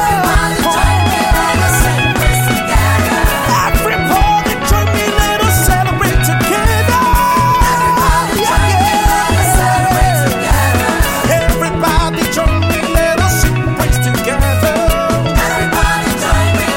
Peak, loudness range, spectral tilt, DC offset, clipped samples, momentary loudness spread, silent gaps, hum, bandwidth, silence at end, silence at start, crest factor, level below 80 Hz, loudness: 0 dBFS; 2 LU; -4.5 dB/octave; 0.3%; under 0.1%; 3 LU; none; none; 17 kHz; 0 s; 0 s; 12 dB; -18 dBFS; -12 LUFS